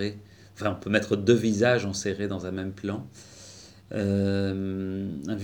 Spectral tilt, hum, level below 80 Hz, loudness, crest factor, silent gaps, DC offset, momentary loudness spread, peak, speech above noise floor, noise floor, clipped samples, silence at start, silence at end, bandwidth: -6 dB/octave; none; -62 dBFS; -27 LUFS; 20 dB; none; under 0.1%; 23 LU; -6 dBFS; 22 dB; -48 dBFS; under 0.1%; 0 s; 0 s; 19.5 kHz